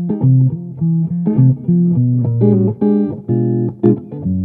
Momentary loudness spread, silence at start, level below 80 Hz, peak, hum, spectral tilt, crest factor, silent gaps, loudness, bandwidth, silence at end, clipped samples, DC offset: 5 LU; 0 s; -50 dBFS; 0 dBFS; none; -15 dB/octave; 14 dB; none; -15 LUFS; 1.8 kHz; 0 s; under 0.1%; under 0.1%